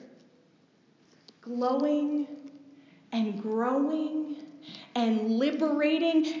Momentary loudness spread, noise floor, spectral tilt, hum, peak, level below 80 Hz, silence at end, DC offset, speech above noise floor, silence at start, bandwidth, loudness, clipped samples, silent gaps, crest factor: 18 LU; -63 dBFS; -6 dB/octave; none; -16 dBFS; under -90 dBFS; 0 s; under 0.1%; 36 dB; 0 s; 7.6 kHz; -29 LUFS; under 0.1%; none; 14 dB